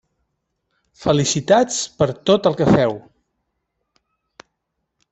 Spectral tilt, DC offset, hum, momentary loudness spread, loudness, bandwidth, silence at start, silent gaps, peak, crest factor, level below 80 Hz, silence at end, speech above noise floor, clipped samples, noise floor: -5 dB/octave; under 0.1%; none; 6 LU; -17 LUFS; 8.4 kHz; 1 s; none; -2 dBFS; 20 dB; -50 dBFS; 2.1 s; 59 dB; under 0.1%; -76 dBFS